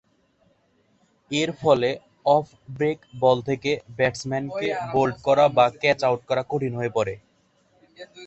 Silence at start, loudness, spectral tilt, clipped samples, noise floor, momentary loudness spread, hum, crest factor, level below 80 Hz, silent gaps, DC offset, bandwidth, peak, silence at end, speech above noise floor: 1.3 s; -23 LUFS; -5.5 dB/octave; under 0.1%; -64 dBFS; 8 LU; none; 20 dB; -58 dBFS; none; under 0.1%; 8.4 kHz; -4 dBFS; 0 s; 42 dB